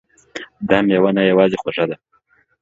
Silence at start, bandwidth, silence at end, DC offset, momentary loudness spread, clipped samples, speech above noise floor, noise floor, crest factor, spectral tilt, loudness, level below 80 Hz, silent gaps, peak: 0.35 s; 7.6 kHz; 0.65 s; under 0.1%; 19 LU; under 0.1%; 44 dB; -59 dBFS; 18 dB; -7 dB/octave; -16 LUFS; -54 dBFS; none; 0 dBFS